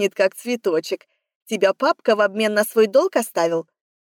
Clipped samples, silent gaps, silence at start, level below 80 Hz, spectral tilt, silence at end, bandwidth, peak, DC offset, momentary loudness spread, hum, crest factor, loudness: under 0.1%; 1.35-1.46 s; 0 s; -84 dBFS; -3.5 dB/octave; 0.45 s; 19 kHz; -6 dBFS; under 0.1%; 10 LU; none; 14 dB; -20 LUFS